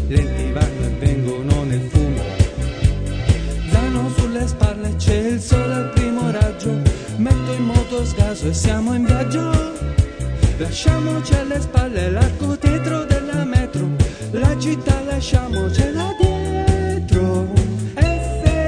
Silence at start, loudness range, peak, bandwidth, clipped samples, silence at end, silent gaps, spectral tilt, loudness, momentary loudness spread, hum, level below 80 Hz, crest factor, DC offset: 0 s; 1 LU; -2 dBFS; 10 kHz; under 0.1%; 0 s; none; -6.5 dB/octave; -19 LUFS; 3 LU; none; -24 dBFS; 16 dB; under 0.1%